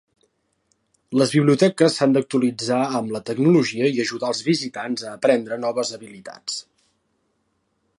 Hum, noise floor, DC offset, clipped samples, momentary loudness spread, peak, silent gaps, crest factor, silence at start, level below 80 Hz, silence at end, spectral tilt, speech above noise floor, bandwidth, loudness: none; -70 dBFS; under 0.1%; under 0.1%; 12 LU; -4 dBFS; none; 18 dB; 1.1 s; -70 dBFS; 1.35 s; -5.5 dB/octave; 50 dB; 11.5 kHz; -21 LUFS